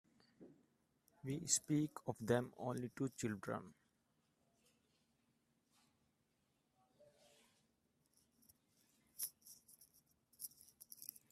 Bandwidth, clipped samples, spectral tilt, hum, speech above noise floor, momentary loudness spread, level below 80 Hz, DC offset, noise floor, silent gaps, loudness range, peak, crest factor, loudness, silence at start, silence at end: 15.5 kHz; under 0.1%; -4.5 dB/octave; none; 41 dB; 24 LU; -82 dBFS; under 0.1%; -83 dBFS; none; 14 LU; -20 dBFS; 28 dB; -43 LUFS; 0.4 s; 0.25 s